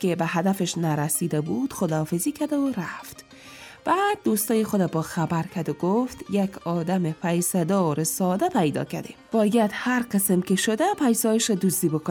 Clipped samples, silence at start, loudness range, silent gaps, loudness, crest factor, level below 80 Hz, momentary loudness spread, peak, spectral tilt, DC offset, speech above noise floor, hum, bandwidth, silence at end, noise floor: under 0.1%; 0 s; 3 LU; none; -24 LUFS; 14 dB; -62 dBFS; 8 LU; -10 dBFS; -5 dB/octave; under 0.1%; 21 dB; none; 19.5 kHz; 0 s; -45 dBFS